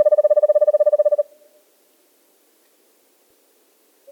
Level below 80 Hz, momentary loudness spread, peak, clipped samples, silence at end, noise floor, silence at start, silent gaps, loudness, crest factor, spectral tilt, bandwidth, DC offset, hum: under -90 dBFS; 7 LU; -6 dBFS; under 0.1%; 2.9 s; -59 dBFS; 0 s; none; -17 LUFS; 14 dB; -2 dB/octave; 1.9 kHz; under 0.1%; none